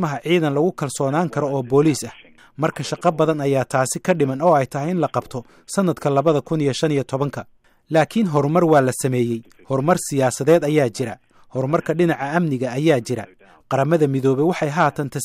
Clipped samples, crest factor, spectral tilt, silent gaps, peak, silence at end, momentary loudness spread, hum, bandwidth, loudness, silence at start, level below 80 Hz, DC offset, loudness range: under 0.1%; 14 dB; -6 dB/octave; none; -4 dBFS; 0 s; 10 LU; none; 15.5 kHz; -20 LUFS; 0 s; -58 dBFS; under 0.1%; 2 LU